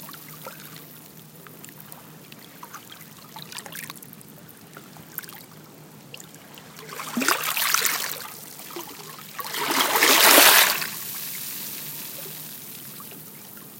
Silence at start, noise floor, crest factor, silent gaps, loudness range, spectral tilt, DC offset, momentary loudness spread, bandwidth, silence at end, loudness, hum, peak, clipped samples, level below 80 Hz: 0 s; -46 dBFS; 26 dB; none; 22 LU; 0 dB/octave; under 0.1%; 27 LU; 17 kHz; 0 s; -19 LUFS; none; 0 dBFS; under 0.1%; -74 dBFS